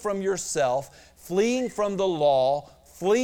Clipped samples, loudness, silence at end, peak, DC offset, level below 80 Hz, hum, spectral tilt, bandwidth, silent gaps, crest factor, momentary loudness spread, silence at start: under 0.1%; -25 LUFS; 0 s; -12 dBFS; under 0.1%; -58 dBFS; none; -4.5 dB/octave; 17.5 kHz; none; 14 dB; 9 LU; 0 s